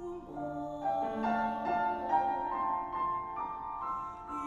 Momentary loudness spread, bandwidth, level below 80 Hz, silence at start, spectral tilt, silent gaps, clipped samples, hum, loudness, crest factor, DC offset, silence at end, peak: 8 LU; 10 kHz; -60 dBFS; 0 s; -7 dB/octave; none; under 0.1%; none; -34 LUFS; 16 dB; under 0.1%; 0 s; -18 dBFS